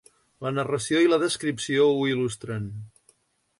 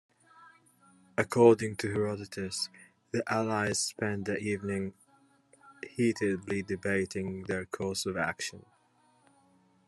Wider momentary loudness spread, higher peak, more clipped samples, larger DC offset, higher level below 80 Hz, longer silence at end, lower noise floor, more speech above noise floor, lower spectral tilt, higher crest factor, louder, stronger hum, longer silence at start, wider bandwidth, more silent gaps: about the same, 13 LU vs 12 LU; about the same, -10 dBFS vs -10 dBFS; neither; neither; first, -62 dBFS vs -72 dBFS; second, 0.75 s vs 1.25 s; about the same, -64 dBFS vs -67 dBFS; about the same, 40 dB vs 37 dB; about the same, -5 dB/octave vs -4.5 dB/octave; second, 16 dB vs 24 dB; first, -24 LUFS vs -31 LUFS; neither; about the same, 0.4 s vs 0.4 s; about the same, 11.5 kHz vs 12.5 kHz; neither